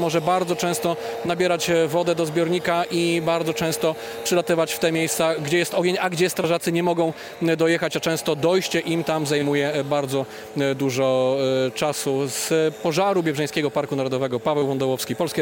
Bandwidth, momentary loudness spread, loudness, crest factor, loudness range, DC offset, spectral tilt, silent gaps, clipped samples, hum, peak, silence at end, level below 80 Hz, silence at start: 17 kHz; 4 LU; -22 LUFS; 14 dB; 1 LU; under 0.1%; -4.5 dB/octave; none; under 0.1%; none; -8 dBFS; 0 s; -62 dBFS; 0 s